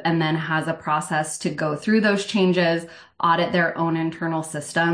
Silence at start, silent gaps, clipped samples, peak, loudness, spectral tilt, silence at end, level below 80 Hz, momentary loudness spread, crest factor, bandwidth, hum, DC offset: 0 s; none; under 0.1%; -6 dBFS; -22 LUFS; -5 dB/octave; 0 s; -64 dBFS; 7 LU; 16 dB; 10.5 kHz; none; under 0.1%